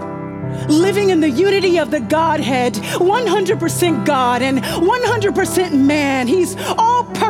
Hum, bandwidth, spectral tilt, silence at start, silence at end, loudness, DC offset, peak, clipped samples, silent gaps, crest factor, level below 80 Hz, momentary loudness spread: none; 17 kHz; -5 dB/octave; 0 s; 0 s; -15 LUFS; under 0.1%; -4 dBFS; under 0.1%; none; 12 dB; -46 dBFS; 3 LU